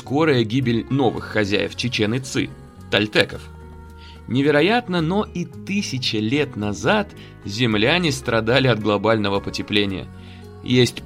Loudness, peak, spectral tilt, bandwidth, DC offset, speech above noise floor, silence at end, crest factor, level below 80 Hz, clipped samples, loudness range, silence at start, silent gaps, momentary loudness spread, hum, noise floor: -20 LUFS; -2 dBFS; -5.5 dB/octave; 15 kHz; under 0.1%; 20 dB; 0 s; 20 dB; -46 dBFS; under 0.1%; 2 LU; 0 s; none; 19 LU; none; -40 dBFS